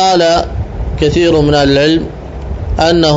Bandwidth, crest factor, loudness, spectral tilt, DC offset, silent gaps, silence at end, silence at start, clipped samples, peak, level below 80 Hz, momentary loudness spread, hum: 8 kHz; 10 dB; -11 LUFS; -5.5 dB/octave; under 0.1%; none; 0 s; 0 s; under 0.1%; 0 dBFS; -22 dBFS; 14 LU; none